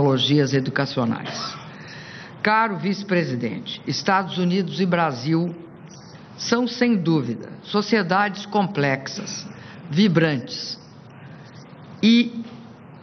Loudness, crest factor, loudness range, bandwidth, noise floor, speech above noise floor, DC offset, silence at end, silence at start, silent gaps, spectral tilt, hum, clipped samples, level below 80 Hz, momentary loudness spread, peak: -22 LUFS; 20 dB; 2 LU; 6.6 kHz; -43 dBFS; 21 dB; under 0.1%; 0 s; 0 s; none; -5.5 dB/octave; none; under 0.1%; -64 dBFS; 23 LU; -4 dBFS